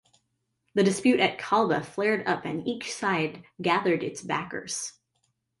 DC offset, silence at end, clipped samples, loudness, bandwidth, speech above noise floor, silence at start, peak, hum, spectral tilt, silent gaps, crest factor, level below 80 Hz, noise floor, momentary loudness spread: under 0.1%; 0.7 s; under 0.1%; -27 LUFS; 11.5 kHz; 50 dB; 0.75 s; -10 dBFS; none; -4.5 dB/octave; none; 18 dB; -68 dBFS; -77 dBFS; 10 LU